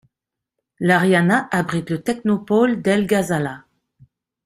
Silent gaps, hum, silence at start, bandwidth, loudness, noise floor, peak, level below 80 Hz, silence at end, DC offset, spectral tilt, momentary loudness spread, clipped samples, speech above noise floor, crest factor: none; none; 0.8 s; 15.5 kHz; -19 LUFS; -84 dBFS; -2 dBFS; -58 dBFS; 0.9 s; under 0.1%; -6 dB/octave; 9 LU; under 0.1%; 66 dB; 18 dB